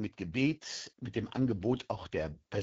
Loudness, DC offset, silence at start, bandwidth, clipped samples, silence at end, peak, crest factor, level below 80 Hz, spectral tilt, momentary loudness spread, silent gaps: -35 LUFS; under 0.1%; 0 s; 8 kHz; under 0.1%; 0 s; -16 dBFS; 18 dB; -58 dBFS; -6 dB/octave; 7 LU; none